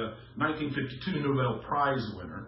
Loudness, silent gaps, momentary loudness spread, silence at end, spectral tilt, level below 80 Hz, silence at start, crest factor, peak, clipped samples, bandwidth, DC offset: -31 LUFS; none; 6 LU; 0 s; -10.5 dB/octave; -56 dBFS; 0 s; 18 dB; -14 dBFS; under 0.1%; 5.8 kHz; under 0.1%